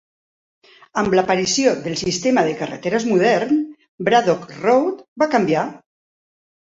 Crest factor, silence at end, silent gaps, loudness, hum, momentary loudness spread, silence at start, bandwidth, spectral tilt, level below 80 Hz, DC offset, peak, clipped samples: 16 dB; 0.85 s; 3.89-3.98 s, 5.08-5.16 s; -19 LUFS; none; 9 LU; 0.95 s; 8 kHz; -4.5 dB/octave; -56 dBFS; under 0.1%; -2 dBFS; under 0.1%